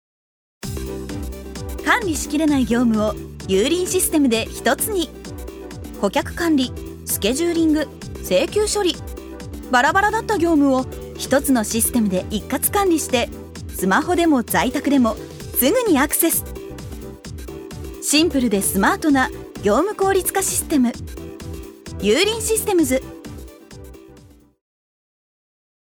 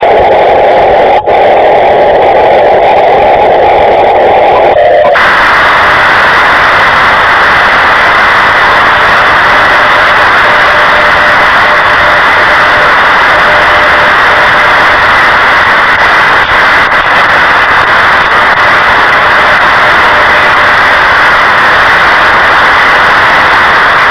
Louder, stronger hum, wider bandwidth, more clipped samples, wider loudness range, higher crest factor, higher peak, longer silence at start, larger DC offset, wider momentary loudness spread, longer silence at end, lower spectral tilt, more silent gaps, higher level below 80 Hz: second, -19 LUFS vs -3 LUFS; neither; first, over 20 kHz vs 5.4 kHz; second, under 0.1% vs 10%; about the same, 3 LU vs 1 LU; first, 18 dB vs 4 dB; about the same, -2 dBFS vs 0 dBFS; first, 0.65 s vs 0 s; neither; first, 17 LU vs 1 LU; first, 1.6 s vs 0 s; about the same, -3.5 dB/octave vs -4 dB/octave; neither; second, -38 dBFS vs -30 dBFS